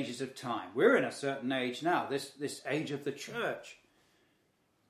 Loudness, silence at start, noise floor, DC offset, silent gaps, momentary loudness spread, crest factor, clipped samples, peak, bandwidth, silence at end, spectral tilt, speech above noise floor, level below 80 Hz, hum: -33 LUFS; 0 s; -74 dBFS; under 0.1%; none; 13 LU; 24 dB; under 0.1%; -12 dBFS; 15.5 kHz; 1.15 s; -4.5 dB/octave; 40 dB; -82 dBFS; none